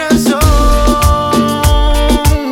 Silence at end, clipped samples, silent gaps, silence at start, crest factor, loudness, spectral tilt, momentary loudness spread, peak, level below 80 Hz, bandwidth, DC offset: 0 s; under 0.1%; none; 0 s; 10 dB; -11 LUFS; -5 dB/octave; 2 LU; 0 dBFS; -12 dBFS; 17.5 kHz; under 0.1%